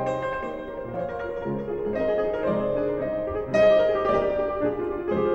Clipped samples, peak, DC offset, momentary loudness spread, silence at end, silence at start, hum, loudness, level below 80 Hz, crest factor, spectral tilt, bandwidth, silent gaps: under 0.1%; -10 dBFS; under 0.1%; 11 LU; 0 s; 0 s; none; -25 LUFS; -48 dBFS; 16 dB; -7.5 dB/octave; 7.8 kHz; none